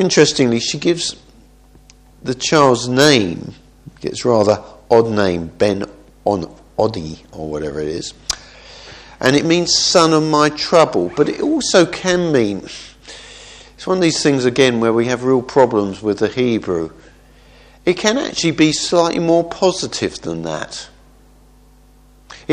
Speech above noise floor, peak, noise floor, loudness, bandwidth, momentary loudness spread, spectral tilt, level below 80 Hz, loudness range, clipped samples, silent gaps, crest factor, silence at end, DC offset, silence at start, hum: 32 dB; 0 dBFS; -47 dBFS; -16 LUFS; 13 kHz; 17 LU; -4 dB/octave; -46 dBFS; 6 LU; under 0.1%; none; 16 dB; 0 s; under 0.1%; 0 s; none